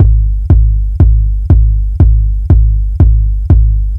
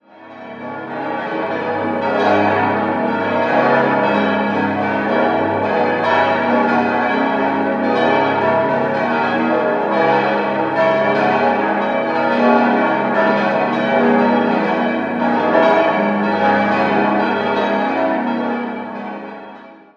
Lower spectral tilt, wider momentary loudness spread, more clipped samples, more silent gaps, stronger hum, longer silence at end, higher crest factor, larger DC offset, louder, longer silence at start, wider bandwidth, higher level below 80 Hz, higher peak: first, -12 dB/octave vs -7 dB/octave; second, 4 LU vs 8 LU; first, 2% vs under 0.1%; neither; neither; second, 0 s vs 0.2 s; second, 8 dB vs 16 dB; first, 0.5% vs under 0.1%; first, -11 LUFS vs -16 LUFS; second, 0 s vs 0.2 s; second, 1.6 kHz vs 7.2 kHz; first, -8 dBFS vs -58 dBFS; about the same, 0 dBFS vs 0 dBFS